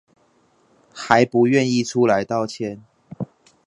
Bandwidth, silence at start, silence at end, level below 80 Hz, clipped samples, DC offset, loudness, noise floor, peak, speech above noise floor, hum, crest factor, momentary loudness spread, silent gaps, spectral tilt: 11 kHz; 0.95 s; 0.4 s; -62 dBFS; under 0.1%; under 0.1%; -19 LUFS; -60 dBFS; 0 dBFS; 42 dB; none; 22 dB; 18 LU; none; -5.5 dB/octave